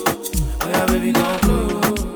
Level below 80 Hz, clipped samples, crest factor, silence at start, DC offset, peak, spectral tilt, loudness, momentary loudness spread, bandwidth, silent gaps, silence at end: -26 dBFS; under 0.1%; 16 dB; 0 s; under 0.1%; -2 dBFS; -5 dB/octave; -19 LUFS; 5 LU; over 20 kHz; none; 0 s